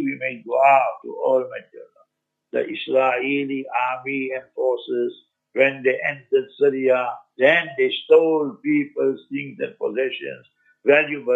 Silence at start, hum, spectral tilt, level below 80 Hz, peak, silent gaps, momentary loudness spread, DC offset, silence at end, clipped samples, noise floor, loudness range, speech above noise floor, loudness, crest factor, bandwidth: 0 s; none; -6.5 dB/octave; -80 dBFS; -2 dBFS; none; 13 LU; under 0.1%; 0 s; under 0.1%; -72 dBFS; 4 LU; 52 dB; -21 LUFS; 20 dB; 7.6 kHz